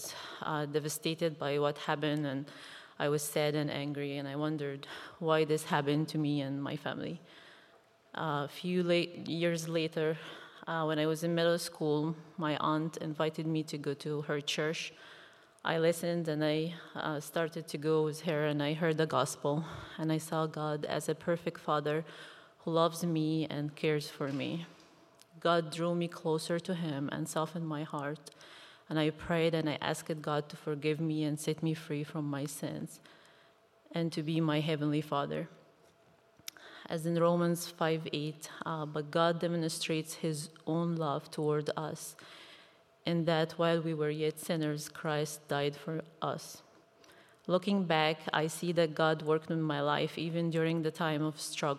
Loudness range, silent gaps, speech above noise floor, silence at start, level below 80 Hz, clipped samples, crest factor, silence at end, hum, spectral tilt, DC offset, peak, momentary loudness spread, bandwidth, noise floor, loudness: 3 LU; none; 32 dB; 0 s; -76 dBFS; under 0.1%; 22 dB; 0 s; none; -5.5 dB/octave; under 0.1%; -12 dBFS; 11 LU; 15 kHz; -65 dBFS; -34 LUFS